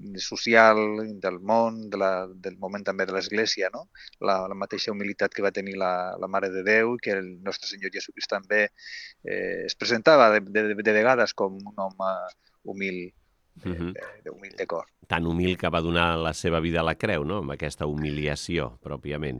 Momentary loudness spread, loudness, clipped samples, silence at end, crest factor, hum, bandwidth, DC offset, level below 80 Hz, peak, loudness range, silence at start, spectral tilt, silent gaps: 15 LU; -25 LUFS; under 0.1%; 0 s; 24 dB; none; 12 kHz; under 0.1%; -52 dBFS; -2 dBFS; 8 LU; 0 s; -5 dB/octave; none